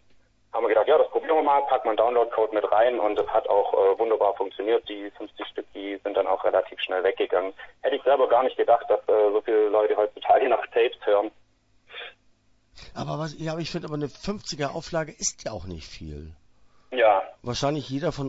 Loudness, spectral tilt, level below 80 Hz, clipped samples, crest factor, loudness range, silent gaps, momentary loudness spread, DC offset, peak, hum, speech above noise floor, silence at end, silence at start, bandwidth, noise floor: -24 LUFS; -4.5 dB/octave; -54 dBFS; under 0.1%; 16 dB; 10 LU; none; 15 LU; under 0.1%; -8 dBFS; none; 38 dB; 0 s; 0.55 s; 8 kHz; -62 dBFS